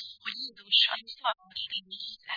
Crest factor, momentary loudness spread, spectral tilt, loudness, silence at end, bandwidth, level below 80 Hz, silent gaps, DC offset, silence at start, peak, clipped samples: 22 dB; 15 LU; -0.5 dB/octave; -28 LUFS; 0 s; 5.4 kHz; -78 dBFS; none; under 0.1%; 0 s; -10 dBFS; under 0.1%